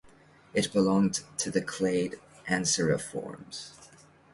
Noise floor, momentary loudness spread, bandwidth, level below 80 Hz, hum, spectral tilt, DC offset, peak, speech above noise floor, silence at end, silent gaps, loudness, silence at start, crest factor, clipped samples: -57 dBFS; 16 LU; 11.5 kHz; -62 dBFS; none; -4 dB/octave; under 0.1%; -12 dBFS; 28 dB; 0.5 s; none; -29 LUFS; 0.55 s; 18 dB; under 0.1%